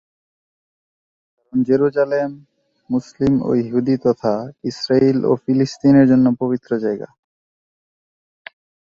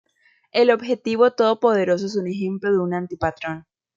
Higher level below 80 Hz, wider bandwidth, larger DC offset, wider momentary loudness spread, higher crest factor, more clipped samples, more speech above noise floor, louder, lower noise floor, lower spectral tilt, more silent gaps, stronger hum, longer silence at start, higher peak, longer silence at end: about the same, -54 dBFS vs -58 dBFS; about the same, 7.4 kHz vs 7.6 kHz; neither; about the same, 11 LU vs 9 LU; about the same, 16 dB vs 18 dB; neither; first, over 73 dB vs 41 dB; first, -18 LUFS vs -21 LUFS; first, under -90 dBFS vs -61 dBFS; first, -7.5 dB/octave vs -6 dB/octave; neither; neither; first, 1.55 s vs 0.55 s; about the same, -2 dBFS vs -4 dBFS; first, 1.95 s vs 0.35 s